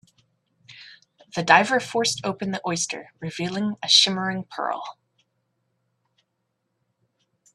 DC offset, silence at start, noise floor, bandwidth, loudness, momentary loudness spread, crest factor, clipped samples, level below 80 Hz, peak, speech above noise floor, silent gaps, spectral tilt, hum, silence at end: under 0.1%; 0.7 s; -76 dBFS; 13 kHz; -22 LUFS; 17 LU; 26 dB; under 0.1%; -70 dBFS; 0 dBFS; 53 dB; none; -2.5 dB/octave; none; 2.65 s